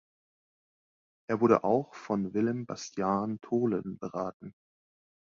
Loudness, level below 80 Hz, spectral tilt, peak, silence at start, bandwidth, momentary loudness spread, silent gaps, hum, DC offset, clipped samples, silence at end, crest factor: -31 LUFS; -68 dBFS; -7 dB/octave; -8 dBFS; 1.3 s; 7.6 kHz; 13 LU; 4.34-4.40 s; none; under 0.1%; under 0.1%; 0.9 s; 24 dB